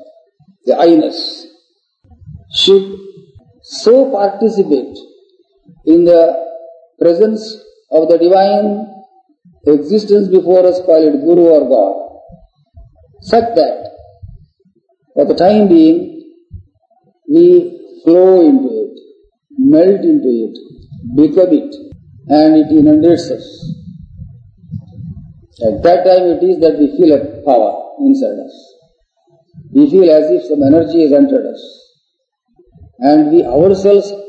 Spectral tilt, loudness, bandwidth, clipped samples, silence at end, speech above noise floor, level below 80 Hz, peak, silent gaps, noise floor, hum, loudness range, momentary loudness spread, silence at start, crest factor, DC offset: -7 dB/octave; -10 LUFS; 8.4 kHz; 0.3%; 0 s; 59 dB; -48 dBFS; 0 dBFS; none; -68 dBFS; none; 4 LU; 20 LU; 0.65 s; 12 dB; under 0.1%